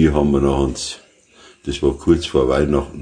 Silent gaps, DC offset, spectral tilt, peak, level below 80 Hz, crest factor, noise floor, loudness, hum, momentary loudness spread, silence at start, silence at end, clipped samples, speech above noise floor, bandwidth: none; under 0.1%; -6 dB/octave; -2 dBFS; -30 dBFS; 16 dB; -48 dBFS; -18 LUFS; none; 12 LU; 0 s; 0 s; under 0.1%; 31 dB; 10 kHz